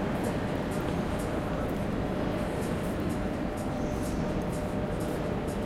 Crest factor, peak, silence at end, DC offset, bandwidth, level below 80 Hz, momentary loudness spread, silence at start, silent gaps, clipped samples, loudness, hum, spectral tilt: 14 dB; -18 dBFS; 0 s; under 0.1%; 16.5 kHz; -42 dBFS; 1 LU; 0 s; none; under 0.1%; -32 LUFS; none; -6.5 dB/octave